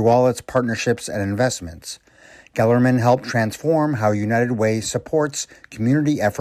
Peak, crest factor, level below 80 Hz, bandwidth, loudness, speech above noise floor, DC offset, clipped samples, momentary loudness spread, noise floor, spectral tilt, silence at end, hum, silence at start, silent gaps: -6 dBFS; 14 dB; -52 dBFS; 15 kHz; -20 LUFS; 29 dB; under 0.1%; under 0.1%; 13 LU; -48 dBFS; -6 dB/octave; 0 s; none; 0 s; none